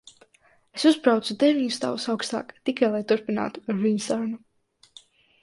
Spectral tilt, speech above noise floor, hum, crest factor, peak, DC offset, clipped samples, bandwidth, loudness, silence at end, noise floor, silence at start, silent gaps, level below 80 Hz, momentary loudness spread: -4.5 dB/octave; 38 dB; none; 20 dB; -6 dBFS; under 0.1%; under 0.1%; 11.5 kHz; -24 LUFS; 1.05 s; -62 dBFS; 0.75 s; none; -70 dBFS; 9 LU